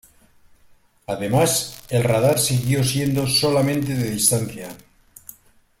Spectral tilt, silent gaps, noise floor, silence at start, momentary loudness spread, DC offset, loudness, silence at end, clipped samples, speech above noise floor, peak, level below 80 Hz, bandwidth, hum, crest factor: -4.5 dB/octave; none; -54 dBFS; 1.1 s; 13 LU; under 0.1%; -20 LUFS; 1.05 s; under 0.1%; 34 dB; -2 dBFS; -50 dBFS; 16.5 kHz; none; 20 dB